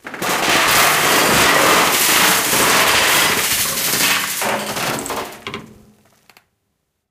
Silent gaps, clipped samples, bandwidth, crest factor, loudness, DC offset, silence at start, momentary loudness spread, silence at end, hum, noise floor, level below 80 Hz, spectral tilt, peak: none; under 0.1%; 16.5 kHz; 16 dB; -13 LUFS; under 0.1%; 0.05 s; 13 LU; 1.45 s; none; -71 dBFS; -46 dBFS; -1 dB/octave; 0 dBFS